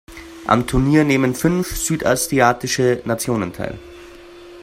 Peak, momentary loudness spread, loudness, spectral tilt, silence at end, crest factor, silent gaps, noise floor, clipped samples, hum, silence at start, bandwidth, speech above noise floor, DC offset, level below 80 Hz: 0 dBFS; 14 LU; -18 LUFS; -5 dB/octave; 0 s; 18 dB; none; -40 dBFS; under 0.1%; none; 0.1 s; 16 kHz; 22 dB; under 0.1%; -36 dBFS